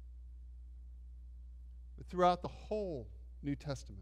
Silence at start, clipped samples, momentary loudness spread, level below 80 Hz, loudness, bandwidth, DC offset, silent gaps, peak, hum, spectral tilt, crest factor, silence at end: 0 s; under 0.1%; 22 LU; -52 dBFS; -38 LUFS; 11.5 kHz; under 0.1%; none; -18 dBFS; none; -6.5 dB/octave; 22 dB; 0 s